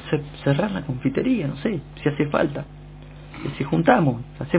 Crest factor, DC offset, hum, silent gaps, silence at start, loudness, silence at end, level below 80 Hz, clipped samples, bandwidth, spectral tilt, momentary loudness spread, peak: 22 dB; under 0.1%; 50 Hz at -45 dBFS; none; 0 s; -23 LUFS; 0 s; -46 dBFS; under 0.1%; 4 kHz; -11.5 dB/octave; 20 LU; 0 dBFS